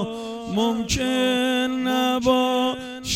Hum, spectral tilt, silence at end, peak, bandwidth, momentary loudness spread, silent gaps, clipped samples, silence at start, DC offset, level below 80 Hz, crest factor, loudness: none; -4 dB/octave; 0 s; -8 dBFS; 16.5 kHz; 8 LU; none; under 0.1%; 0 s; under 0.1%; -46 dBFS; 14 dB; -22 LUFS